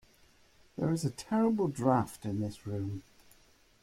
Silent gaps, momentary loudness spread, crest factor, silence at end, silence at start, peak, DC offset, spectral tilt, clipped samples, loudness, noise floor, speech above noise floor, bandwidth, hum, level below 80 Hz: none; 11 LU; 20 dB; 0.8 s; 0.8 s; -14 dBFS; under 0.1%; -7 dB/octave; under 0.1%; -33 LUFS; -64 dBFS; 32 dB; 16 kHz; none; -64 dBFS